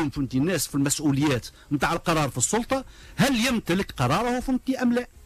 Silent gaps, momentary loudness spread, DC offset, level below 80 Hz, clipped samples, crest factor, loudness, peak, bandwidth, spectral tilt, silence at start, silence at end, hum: none; 5 LU; under 0.1%; -44 dBFS; under 0.1%; 14 dB; -24 LUFS; -12 dBFS; 15.5 kHz; -4.5 dB/octave; 0 s; 0.05 s; none